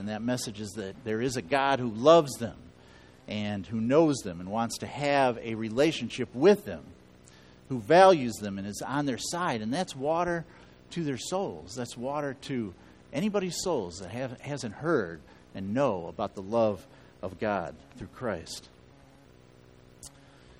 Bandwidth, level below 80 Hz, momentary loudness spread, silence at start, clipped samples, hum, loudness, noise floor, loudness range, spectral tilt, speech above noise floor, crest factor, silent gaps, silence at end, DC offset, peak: 15 kHz; -60 dBFS; 17 LU; 0 s; under 0.1%; none; -29 LUFS; -56 dBFS; 8 LU; -5 dB/octave; 27 dB; 24 dB; none; 0.5 s; under 0.1%; -6 dBFS